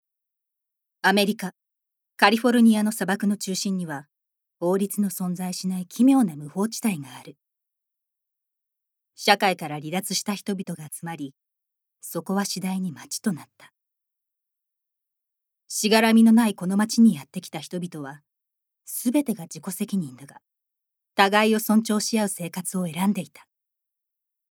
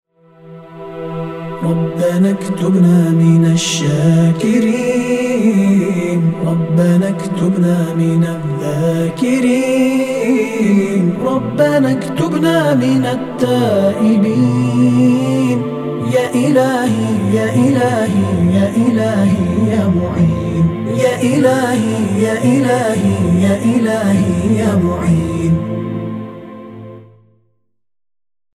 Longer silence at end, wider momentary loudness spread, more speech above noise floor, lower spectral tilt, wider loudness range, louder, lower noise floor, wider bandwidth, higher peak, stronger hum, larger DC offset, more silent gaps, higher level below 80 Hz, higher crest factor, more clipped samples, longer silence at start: second, 1.25 s vs 1.5 s; first, 16 LU vs 6 LU; first, 61 dB vs 53 dB; second, -4.5 dB/octave vs -7 dB/octave; first, 10 LU vs 2 LU; second, -23 LUFS vs -14 LUFS; first, -84 dBFS vs -66 dBFS; first, 18.5 kHz vs 14 kHz; about the same, 0 dBFS vs 0 dBFS; neither; neither; neither; second, -80 dBFS vs -42 dBFS; first, 24 dB vs 12 dB; neither; first, 1.05 s vs 0.45 s